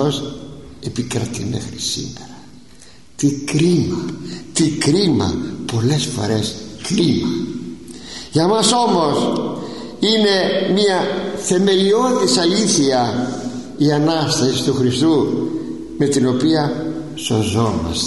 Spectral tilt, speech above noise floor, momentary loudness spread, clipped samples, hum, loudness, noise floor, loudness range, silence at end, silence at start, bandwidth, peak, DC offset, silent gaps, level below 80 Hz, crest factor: -4.5 dB/octave; 28 dB; 14 LU; under 0.1%; none; -17 LUFS; -45 dBFS; 5 LU; 0 s; 0 s; 11.5 kHz; -2 dBFS; 0.7%; none; -46 dBFS; 16 dB